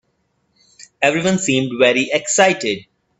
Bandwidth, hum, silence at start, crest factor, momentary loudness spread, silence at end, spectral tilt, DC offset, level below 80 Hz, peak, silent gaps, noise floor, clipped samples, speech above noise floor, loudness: 8.8 kHz; none; 0.8 s; 18 dB; 7 LU; 0.4 s; -3.5 dB/octave; under 0.1%; -58 dBFS; 0 dBFS; none; -66 dBFS; under 0.1%; 50 dB; -16 LUFS